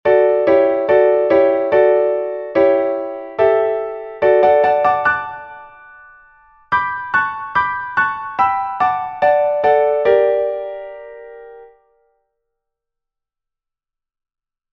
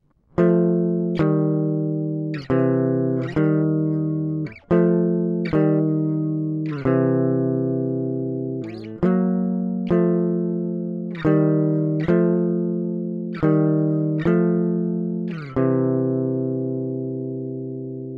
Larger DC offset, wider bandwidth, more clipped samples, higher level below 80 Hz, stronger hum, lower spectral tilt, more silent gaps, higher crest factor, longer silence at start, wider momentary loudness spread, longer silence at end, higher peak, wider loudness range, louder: neither; about the same, 5.6 kHz vs 5.2 kHz; neither; about the same, -56 dBFS vs -52 dBFS; neither; second, -7 dB/octave vs -11.5 dB/octave; neither; about the same, 16 dB vs 16 dB; second, 0.05 s vs 0.35 s; first, 13 LU vs 9 LU; first, 3.1 s vs 0 s; first, 0 dBFS vs -6 dBFS; first, 6 LU vs 2 LU; first, -15 LUFS vs -22 LUFS